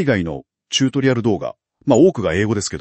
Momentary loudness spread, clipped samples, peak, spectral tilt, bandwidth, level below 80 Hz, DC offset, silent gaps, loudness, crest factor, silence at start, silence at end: 14 LU; under 0.1%; 0 dBFS; -5 dB/octave; 8.8 kHz; -50 dBFS; under 0.1%; none; -18 LUFS; 18 dB; 0 s; 0 s